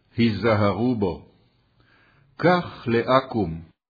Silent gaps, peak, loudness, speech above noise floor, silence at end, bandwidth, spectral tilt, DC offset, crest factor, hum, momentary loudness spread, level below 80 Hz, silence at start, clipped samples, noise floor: none; -4 dBFS; -22 LUFS; 40 dB; 0.25 s; 5 kHz; -9 dB/octave; under 0.1%; 20 dB; none; 8 LU; -52 dBFS; 0.15 s; under 0.1%; -61 dBFS